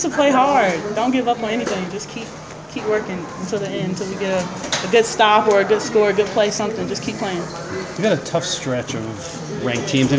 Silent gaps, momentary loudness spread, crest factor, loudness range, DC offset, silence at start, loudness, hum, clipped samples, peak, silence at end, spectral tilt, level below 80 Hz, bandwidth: none; 13 LU; 18 dB; 6 LU; under 0.1%; 0 s; -19 LUFS; none; under 0.1%; 0 dBFS; 0 s; -4.5 dB/octave; -50 dBFS; 8 kHz